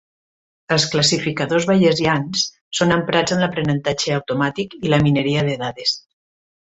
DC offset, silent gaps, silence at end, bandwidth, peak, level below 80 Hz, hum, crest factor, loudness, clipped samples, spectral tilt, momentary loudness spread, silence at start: under 0.1%; 2.61-2.71 s; 0.75 s; 8.2 kHz; -2 dBFS; -50 dBFS; none; 16 dB; -18 LUFS; under 0.1%; -4.5 dB/octave; 6 LU; 0.7 s